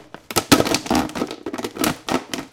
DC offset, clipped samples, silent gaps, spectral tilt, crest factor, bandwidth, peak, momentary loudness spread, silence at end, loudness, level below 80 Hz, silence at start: under 0.1%; under 0.1%; none; -3.5 dB/octave; 22 dB; 17 kHz; 0 dBFS; 12 LU; 0.05 s; -21 LUFS; -46 dBFS; 0 s